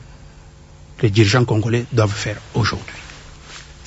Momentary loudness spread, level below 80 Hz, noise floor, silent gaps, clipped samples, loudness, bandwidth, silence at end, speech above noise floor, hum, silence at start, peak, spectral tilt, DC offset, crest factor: 23 LU; -44 dBFS; -42 dBFS; none; under 0.1%; -18 LUFS; 8 kHz; 0 s; 25 dB; none; 0 s; -2 dBFS; -6 dB/octave; under 0.1%; 18 dB